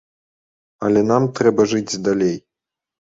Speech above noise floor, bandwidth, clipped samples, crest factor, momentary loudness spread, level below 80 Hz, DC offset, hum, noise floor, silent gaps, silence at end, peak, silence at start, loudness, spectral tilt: 69 dB; 7.8 kHz; under 0.1%; 18 dB; 7 LU; -56 dBFS; under 0.1%; none; -86 dBFS; none; 0.75 s; -2 dBFS; 0.8 s; -18 LUFS; -6 dB/octave